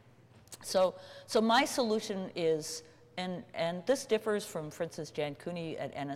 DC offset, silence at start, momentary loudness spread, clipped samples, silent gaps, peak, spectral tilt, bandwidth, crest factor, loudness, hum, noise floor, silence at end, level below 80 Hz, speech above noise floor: under 0.1%; 0.5 s; 13 LU; under 0.1%; none; -18 dBFS; -4 dB/octave; 16.5 kHz; 16 dB; -33 LUFS; none; -59 dBFS; 0 s; -74 dBFS; 26 dB